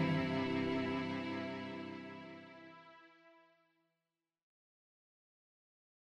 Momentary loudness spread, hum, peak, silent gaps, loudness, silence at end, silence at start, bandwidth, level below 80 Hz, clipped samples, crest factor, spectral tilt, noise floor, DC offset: 21 LU; none; -24 dBFS; none; -39 LUFS; 2.7 s; 0 s; 9 kHz; -74 dBFS; under 0.1%; 20 dB; -7 dB/octave; under -90 dBFS; under 0.1%